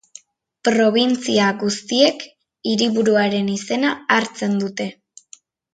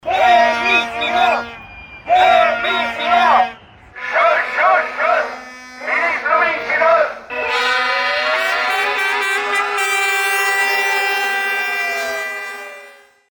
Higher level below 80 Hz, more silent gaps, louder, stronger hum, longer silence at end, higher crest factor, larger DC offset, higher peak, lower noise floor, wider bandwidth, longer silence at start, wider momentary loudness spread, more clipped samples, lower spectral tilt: second, -66 dBFS vs -54 dBFS; neither; second, -19 LUFS vs -15 LUFS; neither; first, 0.85 s vs 0.4 s; about the same, 18 dB vs 14 dB; neither; about the same, 0 dBFS vs -2 dBFS; first, -49 dBFS vs -42 dBFS; second, 9.2 kHz vs 19.5 kHz; first, 0.65 s vs 0.05 s; about the same, 11 LU vs 12 LU; neither; first, -4 dB/octave vs -1 dB/octave